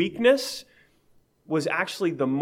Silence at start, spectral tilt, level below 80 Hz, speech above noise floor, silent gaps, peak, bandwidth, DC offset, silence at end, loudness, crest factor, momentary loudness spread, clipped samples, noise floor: 0 s; -4.5 dB/octave; -68 dBFS; 38 dB; none; -8 dBFS; 16.5 kHz; under 0.1%; 0 s; -25 LUFS; 18 dB; 11 LU; under 0.1%; -62 dBFS